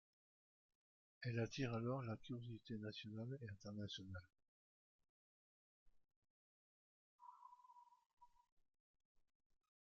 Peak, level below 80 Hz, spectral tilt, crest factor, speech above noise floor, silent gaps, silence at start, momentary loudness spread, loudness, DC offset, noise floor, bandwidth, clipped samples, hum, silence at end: -32 dBFS; -80 dBFS; -5.5 dB/octave; 22 dB; 21 dB; 4.48-4.99 s, 5.09-5.86 s, 6.16-6.22 s, 6.30-7.18 s, 8.06-8.17 s; 1.2 s; 21 LU; -50 LUFS; under 0.1%; -69 dBFS; 7.2 kHz; under 0.1%; none; 1.6 s